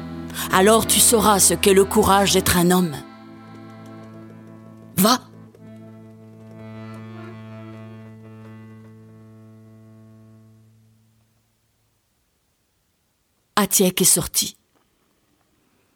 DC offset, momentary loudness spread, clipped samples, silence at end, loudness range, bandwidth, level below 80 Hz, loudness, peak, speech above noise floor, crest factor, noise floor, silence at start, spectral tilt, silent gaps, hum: under 0.1%; 27 LU; under 0.1%; 1.45 s; 24 LU; 20 kHz; -46 dBFS; -17 LUFS; 0 dBFS; 51 dB; 22 dB; -68 dBFS; 0 s; -3 dB/octave; none; none